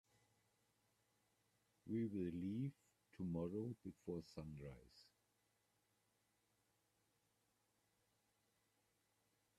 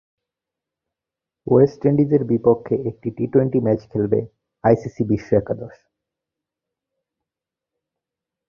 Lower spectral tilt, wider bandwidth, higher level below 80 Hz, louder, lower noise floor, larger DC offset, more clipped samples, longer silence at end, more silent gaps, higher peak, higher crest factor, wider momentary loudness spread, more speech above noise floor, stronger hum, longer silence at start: second, -8.5 dB/octave vs -10.5 dB/octave; first, 13.5 kHz vs 6.8 kHz; second, -78 dBFS vs -52 dBFS; second, -49 LUFS vs -20 LUFS; about the same, -84 dBFS vs -87 dBFS; neither; neither; first, 4.55 s vs 2.8 s; neither; second, -34 dBFS vs -2 dBFS; about the same, 18 dB vs 20 dB; about the same, 13 LU vs 12 LU; second, 37 dB vs 69 dB; neither; first, 1.85 s vs 1.45 s